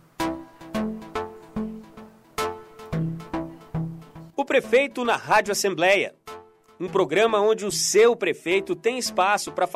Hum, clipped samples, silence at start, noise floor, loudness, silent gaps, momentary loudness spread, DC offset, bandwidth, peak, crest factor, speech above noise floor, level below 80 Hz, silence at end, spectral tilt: none; under 0.1%; 0.2 s; -47 dBFS; -23 LUFS; none; 16 LU; under 0.1%; 15.5 kHz; -8 dBFS; 16 dB; 25 dB; -52 dBFS; 0 s; -3.5 dB/octave